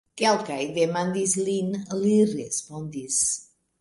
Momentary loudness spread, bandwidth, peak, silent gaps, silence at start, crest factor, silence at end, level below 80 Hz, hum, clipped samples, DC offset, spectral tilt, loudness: 8 LU; 11.5 kHz; -8 dBFS; none; 0.15 s; 16 dB; 0.4 s; -66 dBFS; none; under 0.1%; under 0.1%; -4 dB/octave; -24 LUFS